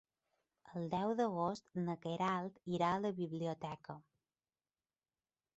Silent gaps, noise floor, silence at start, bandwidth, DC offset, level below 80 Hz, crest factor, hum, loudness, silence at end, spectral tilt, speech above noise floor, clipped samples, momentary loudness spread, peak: none; under -90 dBFS; 0.65 s; 8 kHz; under 0.1%; -76 dBFS; 18 dB; none; -40 LUFS; 1.55 s; -6 dB/octave; over 51 dB; under 0.1%; 12 LU; -22 dBFS